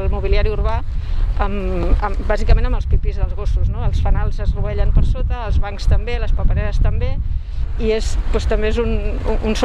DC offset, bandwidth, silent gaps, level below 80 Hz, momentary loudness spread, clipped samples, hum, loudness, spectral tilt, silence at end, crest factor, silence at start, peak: under 0.1%; 8.4 kHz; none; -16 dBFS; 5 LU; under 0.1%; none; -21 LUFS; -7 dB/octave; 0 s; 14 dB; 0 s; -2 dBFS